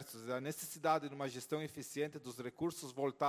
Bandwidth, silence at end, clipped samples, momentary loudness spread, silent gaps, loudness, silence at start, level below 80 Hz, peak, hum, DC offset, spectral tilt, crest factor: 16 kHz; 0 s; under 0.1%; 8 LU; none; -41 LUFS; 0 s; -78 dBFS; -20 dBFS; none; under 0.1%; -4.5 dB/octave; 20 dB